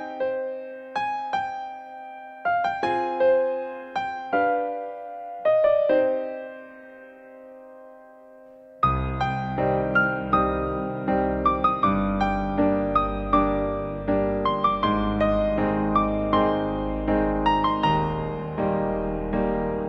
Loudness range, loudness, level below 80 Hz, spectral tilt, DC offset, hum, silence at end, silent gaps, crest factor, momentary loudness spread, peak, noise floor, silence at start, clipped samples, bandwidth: 4 LU; -24 LUFS; -38 dBFS; -8 dB/octave; under 0.1%; none; 0 s; none; 18 dB; 12 LU; -6 dBFS; -48 dBFS; 0 s; under 0.1%; 7.8 kHz